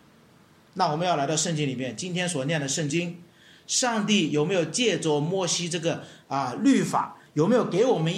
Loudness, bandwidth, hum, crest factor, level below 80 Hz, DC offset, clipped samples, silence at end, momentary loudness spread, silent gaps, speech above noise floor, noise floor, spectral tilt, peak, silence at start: -25 LUFS; 14.5 kHz; none; 16 dB; -70 dBFS; under 0.1%; under 0.1%; 0 s; 8 LU; none; 31 dB; -56 dBFS; -4 dB/octave; -10 dBFS; 0.75 s